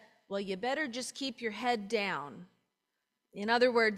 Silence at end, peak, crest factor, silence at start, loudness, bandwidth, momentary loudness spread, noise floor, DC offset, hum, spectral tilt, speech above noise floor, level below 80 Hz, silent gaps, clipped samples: 0 s; -14 dBFS; 20 dB; 0.3 s; -33 LUFS; 13.5 kHz; 14 LU; -85 dBFS; under 0.1%; none; -3.5 dB/octave; 53 dB; -78 dBFS; none; under 0.1%